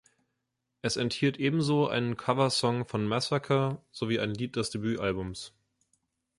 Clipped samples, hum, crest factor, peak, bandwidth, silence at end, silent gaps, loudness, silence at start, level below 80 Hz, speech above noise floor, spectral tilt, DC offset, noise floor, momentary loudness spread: under 0.1%; none; 20 dB; -12 dBFS; 11.5 kHz; 0.9 s; none; -29 LUFS; 0.85 s; -60 dBFS; 53 dB; -5.5 dB/octave; under 0.1%; -82 dBFS; 9 LU